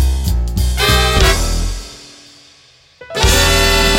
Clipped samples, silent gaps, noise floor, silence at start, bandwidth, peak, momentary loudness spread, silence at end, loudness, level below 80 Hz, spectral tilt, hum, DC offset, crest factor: under 0.1%; none; -47 dBFS; 0 s; 17 kHz; 0 dBFS; 16 LU; 0 s; -13 LUFS; -18 dBFS; -3 dB/octave; none; under 0.1%; 14 dB